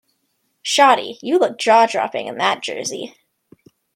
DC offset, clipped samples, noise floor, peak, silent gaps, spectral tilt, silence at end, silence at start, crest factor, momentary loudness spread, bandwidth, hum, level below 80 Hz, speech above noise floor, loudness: under 0.1%; under 0.1%; -69 dBFS; 0 dBFS; none; -2 dB/octave; 0.85 s; 0.65 s; 18 dB; 14 LU; 16.5 kHz; none; -74 dBFS; 52 dB; -17 LUFS